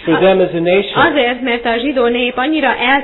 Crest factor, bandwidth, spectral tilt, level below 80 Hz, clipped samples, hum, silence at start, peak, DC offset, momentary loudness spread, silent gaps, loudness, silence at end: 12 dB; 4.3 kHz; -8.5 dB/octave; -44 dBFS; under 0.1%; none; 0 s; 0 dBFS; under 0.1%; 4 LU; none; -13 LUFS; 0 s